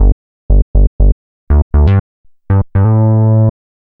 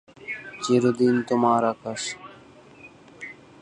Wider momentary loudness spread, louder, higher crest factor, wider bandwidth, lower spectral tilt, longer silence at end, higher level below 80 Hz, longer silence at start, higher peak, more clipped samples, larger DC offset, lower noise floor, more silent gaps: second, 6 LU vs 19 LU; first, -12 LUFS vs -23 LUFS; second, 10 dB vs 18 dB; second, 3.4 kHz vs 10 kHz; first, -12.5 dB/octave vs -5 dB/octave; first, 0.5 s vs 0.3 s; first, -14 dBFS vs -66 dBFS; second, 0 s vs 0.2 s; first, 0 dBFS vs -8 dBFS; neither; neither; first, under -90 dBFS vs -49 dBFS; first, 0.12-0.49 s, 0.62-0.74 s, 0.87-0.99 s, 1.12-1.47 s, 1.62-1.70 s, 2.00-2.24 s vs none